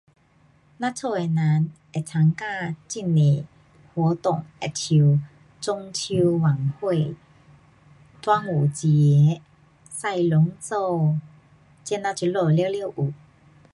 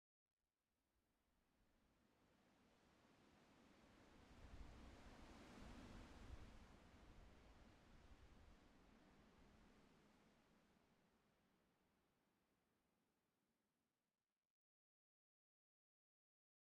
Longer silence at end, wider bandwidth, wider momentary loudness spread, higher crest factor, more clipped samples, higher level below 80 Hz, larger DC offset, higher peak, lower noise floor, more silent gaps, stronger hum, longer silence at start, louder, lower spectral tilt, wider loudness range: second, 0.6 s vs 3.15 s; about the same, 11.5 kHz vs 10.5 kHz; first, 11 LU vs 7 LU; second, 16 dB vs 22 dB; neither; first, -62 dBFS vs -74 dBFS; neither; first, -6 dBFS vs -48 dBFS; second, -59 dBFS vs under -90 dBFS; neither; neither; second, 0.8 s vs 0.95 s; first, -23 LUFS vs -65 LUFS; about the same, -6.5 dB/octave vs -5.5 dB/octave; about the same, 3 LU vs 4 LU